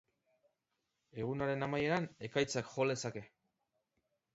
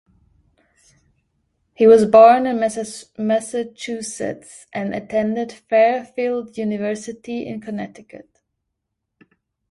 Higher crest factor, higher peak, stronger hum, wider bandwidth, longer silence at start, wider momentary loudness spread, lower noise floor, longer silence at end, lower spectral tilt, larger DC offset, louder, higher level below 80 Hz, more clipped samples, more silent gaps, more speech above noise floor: about the same, 20 dB vs 20 dB; second, -20 dBFS vs 0 dBFS; neither; second, 7.6 kHz vs 11.5 kHz; second, 1.15 s vs 1.8 s; second, 9 LU vs 18 LU; first, -86 dBFS vs -78 dBFS; second, 1.1 s vs 1.55 s; about the same, -4.5 dB/octave vs -5 dB/octave; neither; second, -37 LUFS vs -18 LUFS; second, -70 dBFS vs -62 dBFS; neither; neither; second, 49 dB vs 60 dB